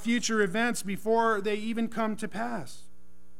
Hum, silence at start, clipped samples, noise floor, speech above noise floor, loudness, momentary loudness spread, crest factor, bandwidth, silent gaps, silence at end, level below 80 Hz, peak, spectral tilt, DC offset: none; 0 s; under 0.1%; -62 dBFS; 33 dB; -29 LUFS; 9 LU; 18 dB; 16 kHz; none; 0.6 s; -64 dBFS; -14 dBFS; -4 dB/octave; 2%